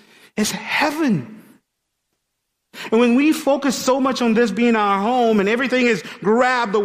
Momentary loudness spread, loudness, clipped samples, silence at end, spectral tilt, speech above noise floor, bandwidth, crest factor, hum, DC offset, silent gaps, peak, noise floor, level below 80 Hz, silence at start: 6 LU; -18 LUFS; under 0.1%; 0 s; -4.5 dB/octave; 58 dB; 15.5 kHz; 14 dB; none; under 0.1%; none; -4 dBFS; -75 dBFS; -60 dBFS; 0.35 s